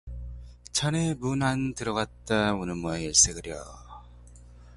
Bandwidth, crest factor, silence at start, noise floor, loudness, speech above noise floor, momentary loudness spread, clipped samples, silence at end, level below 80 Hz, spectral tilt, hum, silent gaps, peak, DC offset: 11.5 kHz; 22 dB; 0.05 s; -49 dBFS; -26 LUFS; 22 dB; 22 LU; under 0.1%; 0 s; -46 dBFS; -3 dB/octave; 60 Hz at -45 dBFS; none; -6 dBFS; under 0.1%